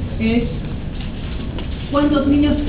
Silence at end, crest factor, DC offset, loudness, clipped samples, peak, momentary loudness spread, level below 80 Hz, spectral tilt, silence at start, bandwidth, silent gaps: 0 s; 14 dB; under 0.1%; -20 LUFS; under 0.1%; -4 dBFS; 12 LU; -26 dBFS; -11.5 dB/octave; 0 s; 4 kHz; none